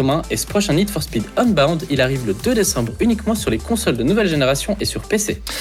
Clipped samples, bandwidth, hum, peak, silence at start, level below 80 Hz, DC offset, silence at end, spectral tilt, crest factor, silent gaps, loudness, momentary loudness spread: under 0.1%; 18 kHz; none; -4 dBFS; 0 s; -34 dBFS; under 0.1%; 0 s; -4.5 dB/octave; 14 dB; none; -18 LUFS; 4 LU